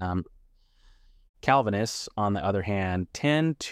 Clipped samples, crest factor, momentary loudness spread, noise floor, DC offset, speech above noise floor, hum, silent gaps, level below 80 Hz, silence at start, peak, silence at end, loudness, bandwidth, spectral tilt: under 0.1%; 20 dB; 8 LU; -59 dBFS; under 0.1%; 33 dB; none; 1.29-1.34 s; -54 dBFS; 0 s; -8 dBFS; 0 s; -27 LUFS; 15 kHz; -5.5 dB/octave